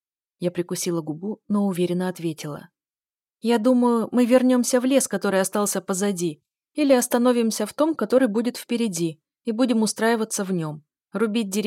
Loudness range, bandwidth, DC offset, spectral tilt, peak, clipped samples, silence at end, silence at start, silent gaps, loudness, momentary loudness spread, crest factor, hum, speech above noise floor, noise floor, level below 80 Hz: 4 LU; 16.5 kHz; under 0.1%; -4.5 dB/octave; -8 dBFS; under 0.1%; 0 s; 0.4 s; none; -22 LUFS; 11 LU; 16 dB; none; over 68 dB; under -90 dBFS; -74 dBFS